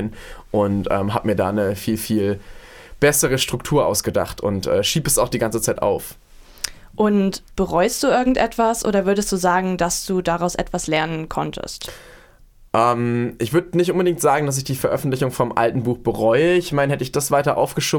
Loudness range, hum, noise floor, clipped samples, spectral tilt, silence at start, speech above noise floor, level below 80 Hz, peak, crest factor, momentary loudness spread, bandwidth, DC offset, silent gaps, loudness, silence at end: 3 LU; none; -48 dBFS; under 0.1%; -4.5 dB/octave; 0 s; 29 dB; -42 dBFS; 0 dBFS; 20 dB; 8 LU; 19 kHz; under 0.1%; none; -20 LUFS; 0 s